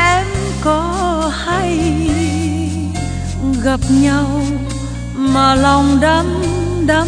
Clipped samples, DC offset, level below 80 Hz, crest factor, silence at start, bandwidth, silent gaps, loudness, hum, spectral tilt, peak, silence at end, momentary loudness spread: under 0.1%; under 0.1%; -26 dBFS; 14 dB; 0 s; 10 kHz; none; -15 LUFS; none; -5.5 dB/octave; 0 dBFS; 0 s; 9 LU